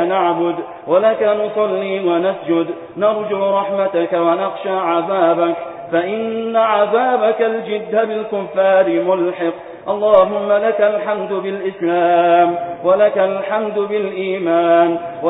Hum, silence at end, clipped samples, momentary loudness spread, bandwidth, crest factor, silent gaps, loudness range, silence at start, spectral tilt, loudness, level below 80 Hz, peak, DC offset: none; 0 s; under 0.1%; 8 LU; 4 kHz; 16 dB; none; 2 LU; 0 s; -10 dB/octave; -16 LUFS; -62 dBFS; 0 dBFS; under 0.1%